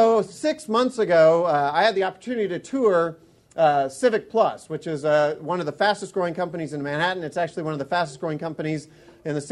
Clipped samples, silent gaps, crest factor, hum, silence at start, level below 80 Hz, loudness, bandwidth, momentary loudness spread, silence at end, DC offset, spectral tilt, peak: under 0.1%; none; 16 dB; none; 0 s; -66 dBFS; -23 LUFS; 12 kHz; 10 LU; 0 s; under 0.1%; -5.5 dB/octave; -6 dBFS